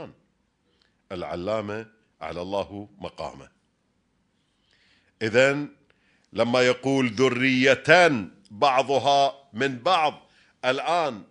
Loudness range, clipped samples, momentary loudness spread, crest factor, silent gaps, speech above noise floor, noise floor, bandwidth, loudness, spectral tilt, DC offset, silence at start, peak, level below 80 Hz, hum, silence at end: 14 LU; under 0.1%; 18 LU; 24 dB; none; 47 dB; -70 dBFS; 10.5 kHz; -23 LUFS; -4.5 dB/octave; under 0.1%; 0 s; -2 dBFS; -64 dBFS; none; 0.1 s